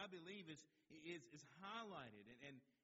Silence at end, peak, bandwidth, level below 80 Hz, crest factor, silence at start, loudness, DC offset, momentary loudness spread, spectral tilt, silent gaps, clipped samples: 0.15 s; -40 dBFS; 7.6 kHz; under -90 dBFS; 18 dB; 0 s; -57 LUFS; under 0.1%; 9 LU; -3 dB/octave; none; under 0.1%